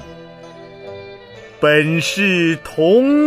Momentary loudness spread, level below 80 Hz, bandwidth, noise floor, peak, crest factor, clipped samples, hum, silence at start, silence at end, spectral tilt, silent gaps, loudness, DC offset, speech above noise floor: 24 LU; -52 dBFS; 15.5 kHz; -38 dBFS; 0 dBFS; 16 dB; under 0.1%; none; 0 s; 0 s; -5.5 dB/octave; none; -15 LUFS; under 0.1%; 24 dB